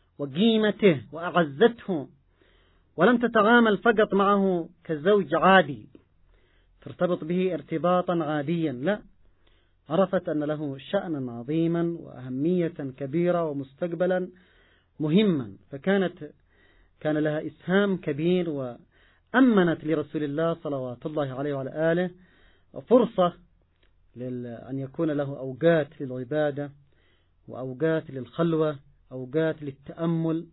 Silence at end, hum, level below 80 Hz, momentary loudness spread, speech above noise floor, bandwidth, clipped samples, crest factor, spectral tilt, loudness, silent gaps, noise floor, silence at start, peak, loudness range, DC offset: 0.1 s; none; -62 dBFS; 15 LU; 38 dB; 4.1 kHz; under 0.1%; 20 dB; -11 dB/octave; -25 LUFS; none; -63 dBFS; 0.2 s; -6 dBFS; 6 LU; under 0.1%